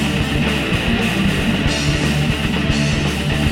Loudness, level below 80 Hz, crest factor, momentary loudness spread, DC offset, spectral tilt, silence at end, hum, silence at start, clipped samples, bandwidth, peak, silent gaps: -17 LUFS; -26 dBFS; 14 dB; 1 LU; under 0.1%; -5 dB/octave; 0 s; none; 0 s; under 0.1%; 16.5 kHz; -4 dBFS; none